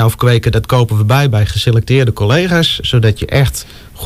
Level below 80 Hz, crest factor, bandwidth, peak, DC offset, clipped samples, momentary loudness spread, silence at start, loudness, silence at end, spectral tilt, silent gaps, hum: -30 dBFS; 10 dB; 15.5 kHz; -2 dBFS; under 0.1%; under 0.1%; 2 LU; 0 s; -12 LUFS; 0 s; -5.5 dB/octave; none; none